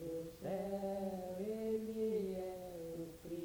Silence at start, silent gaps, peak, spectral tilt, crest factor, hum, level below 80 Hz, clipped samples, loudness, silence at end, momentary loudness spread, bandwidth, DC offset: 0 s; none; -28 dBFS; -7 dB/octave; 14 dB; none; -66 dBFS; under 0.1%; -43 LUFS; 0 s; 8 LU; over 20 kHz; under 0.1%